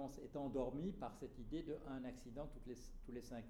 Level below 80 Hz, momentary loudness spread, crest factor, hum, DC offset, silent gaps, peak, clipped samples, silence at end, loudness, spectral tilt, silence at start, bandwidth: -58 dBFS; 10 LU; 18 dB; none; under 0.1%; none; -30 dBFS; under 0.1%; 0 s; -49 LUFS; -7 dB/octave; 0 s; 17.5 kHz